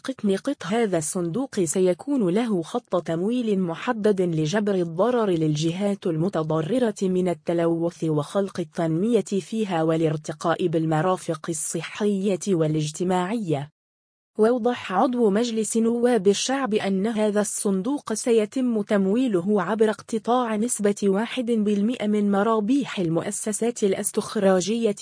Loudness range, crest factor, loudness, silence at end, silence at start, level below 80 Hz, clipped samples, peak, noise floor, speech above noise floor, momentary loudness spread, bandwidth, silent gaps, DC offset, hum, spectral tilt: 2 LU; 16 dB; -23 LUFS; 0 s; 0.05 s; -66 dBFS; under 0.1%; -8 dBFS; under -90 dBFS; over 67 dB; 5 LU; 10.5 kHz; 13.72-14.34 s; under 0.1%; none; -5.5 dB/octave